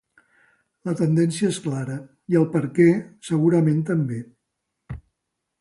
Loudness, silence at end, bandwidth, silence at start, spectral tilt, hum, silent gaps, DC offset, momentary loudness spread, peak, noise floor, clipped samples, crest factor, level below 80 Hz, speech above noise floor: -22 LUFS; 0.6 s; 11.5 kHz; 0.85 s; -7.5 dB/octave; none; none; under 0.1%; 17 LU; -4 dBFS; -80 dBFS; under 0.1%; 18 dB; -56 dBFS; 59 dB